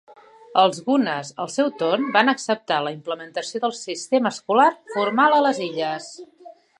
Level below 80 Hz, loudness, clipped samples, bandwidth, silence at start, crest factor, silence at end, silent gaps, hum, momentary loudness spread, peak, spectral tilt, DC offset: -78 dBFS; -21 LUFS; under 0.1%; 11 kHz; 0.1 s; 20 dB; 0.3 s; none; none; 11 LU; -2 dBFS; -3.5 dB/octave; under 0.1%